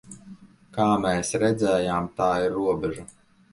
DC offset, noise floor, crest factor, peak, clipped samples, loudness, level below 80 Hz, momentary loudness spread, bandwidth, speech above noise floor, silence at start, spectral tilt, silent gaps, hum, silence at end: under 0.1%; -47 dBFS; 16 dB; -8 dBFS; under 0.1%; -24 LUFS; -52 dBFS; 15 LU; 11.5 kHz; 24 dB; 0.05 s; -5.5 dB/octave; none; none; 0.45 s